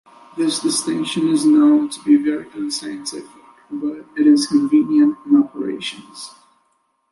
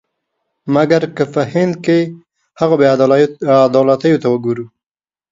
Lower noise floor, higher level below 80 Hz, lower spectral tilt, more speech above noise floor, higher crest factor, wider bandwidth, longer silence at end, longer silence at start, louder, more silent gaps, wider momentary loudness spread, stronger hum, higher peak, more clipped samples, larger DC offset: second, -65 dBFS vs under -90 dBFS; second, -66 dBFS vs -58 dBFS; second, -4 dB/octave vs -7.5 dB/octave; second, 48 dB vs over 77 dB; about the same, 14 dB vs 14 dB; first, 11.5 kHz vs 7.6 kHz; first, 0.8 s vs 0.65 s; second, 0.35 s vs 0.65 s; second, -17 LUFS vs -14 LUFS; neither; first, 19 LU vs 10 LU; neither; second, -4 dBFS vs 0 dBFS; neither; neither